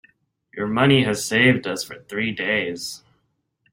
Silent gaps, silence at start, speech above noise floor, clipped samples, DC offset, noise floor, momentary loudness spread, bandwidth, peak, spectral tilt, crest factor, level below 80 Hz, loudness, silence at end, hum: none; 0.55 s; 50 dB; under 0.1%; under 0.1%; -71 dBFS; 15 LU; 16.5 kHz; -2 dBFS; -4.5 dB/octave; 20 dB; -56 dBFS; -20 LUFS; 0.75 s; none